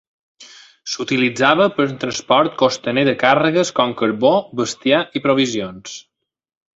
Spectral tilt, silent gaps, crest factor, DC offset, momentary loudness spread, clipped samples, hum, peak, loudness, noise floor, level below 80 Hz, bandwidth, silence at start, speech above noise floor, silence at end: -4.5 dB/octave; none; 16 dB; under 0.1%; 12 LU; under 0.1%; none; -2 dBFS; -17 LUFS; -44 dBFS; -60 dBFS; 8 kHz; 0.4 s; 27 dB; 0.75 s